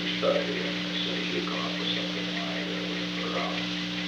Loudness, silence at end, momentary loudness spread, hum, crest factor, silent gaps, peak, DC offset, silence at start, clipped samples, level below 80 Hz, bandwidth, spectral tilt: -29 LUFS; 0 s; 4 LU; 60 Hz at -40 dBFS; 18 dB; none; -12 dBFS; under 0.1%; 0 s; under 0.1%; -60 dBFS; 10.5 kHz; -4.5 dB/octave